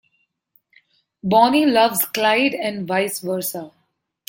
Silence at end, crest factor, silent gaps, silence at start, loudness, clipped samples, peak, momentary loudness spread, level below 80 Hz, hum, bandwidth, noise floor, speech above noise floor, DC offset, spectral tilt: 0.6 s; 18 dB; none; 1.25 s; -18 LUFS; under 0.1%; -2 dBFS; 11 LU; -64 dBFS; none; 17 kHz; -68 dBFS; 50 dB; under 0.1%; -3.5 dB/octave